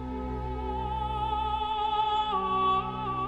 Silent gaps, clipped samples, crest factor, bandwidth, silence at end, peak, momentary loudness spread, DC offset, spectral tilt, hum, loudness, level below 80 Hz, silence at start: none; under 0.1%; 14 dB; 8.4 kHz; 0 s; -16 dBFS; 8 LU; under 0.1%; -7 dB/octave; none; -29 LUFS; -40 dBFS; 0 s